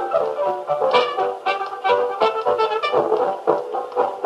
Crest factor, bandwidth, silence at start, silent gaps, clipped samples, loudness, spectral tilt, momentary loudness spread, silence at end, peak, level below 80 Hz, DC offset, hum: 18 dB; 11.5 kHz; 0 s; none; under 0.1%; -20 LUFS; -4.5 dB/octave; 5 LU; 0 s; -2 dBFS; -74 dBFS; under 0.1%; none